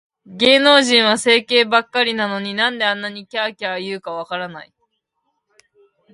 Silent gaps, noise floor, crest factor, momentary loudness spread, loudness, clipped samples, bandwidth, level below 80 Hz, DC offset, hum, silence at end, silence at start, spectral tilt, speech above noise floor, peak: none; -72 dBFS; 18 dB; 15 LU; -16 LUFS; under 0.1%; 11.5 kHz; -66 dBFS; under 0.1%; none; 1.5 s; 0.3 s; -2.5 dB/octave; 55 dB; 0 dBFS